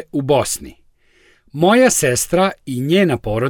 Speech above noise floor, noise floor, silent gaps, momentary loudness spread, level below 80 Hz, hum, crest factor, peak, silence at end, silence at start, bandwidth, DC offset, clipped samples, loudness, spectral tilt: 38 dB; -54 dBFS; none; 11 LU; -44 dBFS; none; 14 dB; -2 dBFS; 0 s; 0 s; 18 kHz; under 0.1%; under 0.1%; -16 LUFS; -4.5 dB/octave